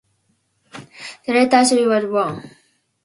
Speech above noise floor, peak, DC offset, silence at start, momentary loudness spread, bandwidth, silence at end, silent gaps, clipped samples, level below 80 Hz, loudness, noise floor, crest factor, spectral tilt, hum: 50 dB; 0 dBFS; under 0.1%; 0.75 s; 21 LU; 11.5 kHz; 0.55 s; none; under 0.1%; -66 dBFS; -16 LUFS; -66 dBFS; 18 dB; -3.5 dB/octave; none